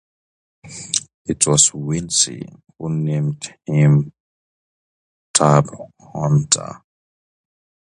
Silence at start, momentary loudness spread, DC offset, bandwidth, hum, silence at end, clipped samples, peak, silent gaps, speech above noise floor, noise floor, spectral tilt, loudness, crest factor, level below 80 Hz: 0.65 s; 20 LU; under 0.1%; 11 kHz; none; 1.15 s; under 0.1%; 0 dBFS; 1.14-1.25 s, 4.20-5.34 s; over 72 dB; under -90 dBFS; -4 dB/octave; -17 LUFS; 20 dB; -52 dBFS